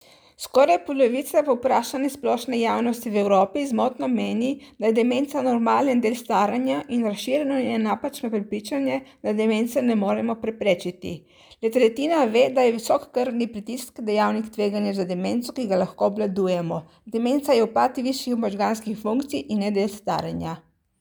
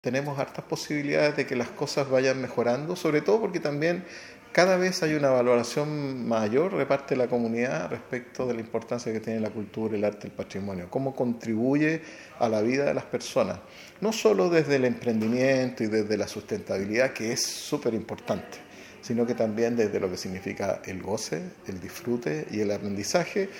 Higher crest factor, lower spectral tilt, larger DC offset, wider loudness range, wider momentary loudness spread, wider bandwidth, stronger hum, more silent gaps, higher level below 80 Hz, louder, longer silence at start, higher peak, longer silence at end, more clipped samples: about the same, 18 dB vs 22 dB; about the same, -5.5 dB/octave vs -5 dB/octave; neither; about the same, 3 LU vs 5 LU; about the same, 8 LU vs 10 LU; first, over 20 kHz vs 17.5 kHz; neither; neither; about the same, -66 dBFS vs -66 dBFS; first, -23 LUFS vs -27 LUFS; first, 0.4 s vs 0.05 s; about the same, -6 dBFS vs -6 dBFS; first, 0.4 s vs 0 s; neither